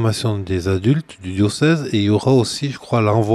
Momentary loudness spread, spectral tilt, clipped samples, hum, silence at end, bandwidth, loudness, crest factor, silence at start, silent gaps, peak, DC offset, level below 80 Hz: 6 LU; -6.5 dB/octave; under 0.1%; none; 0 s; 13 kHz; -18 LUFS; 14 dB; 0 s; none; -2 dBFS; under 0.1%; -52 dBFS